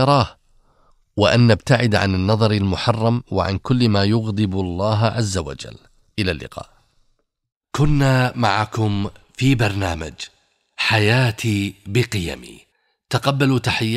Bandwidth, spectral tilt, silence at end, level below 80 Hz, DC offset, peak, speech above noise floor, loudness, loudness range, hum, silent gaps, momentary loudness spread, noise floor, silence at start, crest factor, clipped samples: 14 kHz; -6 dB/octave; 0 s; -40 dBFS; under 0.1%; 0 dBFS; 47 dB; -19 LUFS; 5 LU; none; 7.57-7.61 s; 14 LU; -65 dBFS; 0 s; 18 dB; under 0.1%